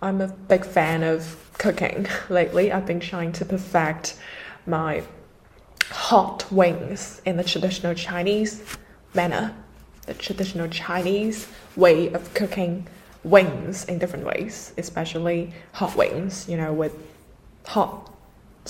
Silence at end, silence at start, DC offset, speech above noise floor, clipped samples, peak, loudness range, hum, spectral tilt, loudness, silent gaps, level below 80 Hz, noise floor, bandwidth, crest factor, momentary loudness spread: 0 s; 0 s; under 0.1%; 28 dB; under 0.1%; 0 dBFS; 5 LU; none; -5 dB/octave; -23 LUFS; none; -52 dBFS; -51 dBFS; 16 kHz; 24 dB; 15 LU